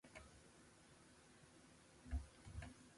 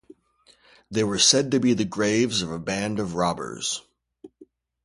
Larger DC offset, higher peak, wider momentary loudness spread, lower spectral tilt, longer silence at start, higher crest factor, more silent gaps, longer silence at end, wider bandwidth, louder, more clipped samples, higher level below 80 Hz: neither; second, -36 dBFS vs -4 dBFS; first, 15 LU vs 11 LU; first, -5 dB/octave vs -3 dB/octave; second, 0.05 s vs 0.9 s; about the same, 20 dB vs 22 dB; neither; second, 0 s vs 0.4 s; about the same, 11.5 kHz vs 11.5 kHz; second, -58 LUFS vs -23 LUFS; neither; about the same, -58 dBFS vs -56 dBFS